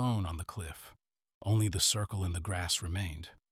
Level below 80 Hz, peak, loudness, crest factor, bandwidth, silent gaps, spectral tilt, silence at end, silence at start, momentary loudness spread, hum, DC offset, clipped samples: -50 dBFS; -14 dBFS; -33 LUFS; 20 dB; 16 kHz; 1.34-1.41 s; -3.5 dB/octave; 0.2 s; 0 s; 16 LU; none; under 0.1%; under 0.1%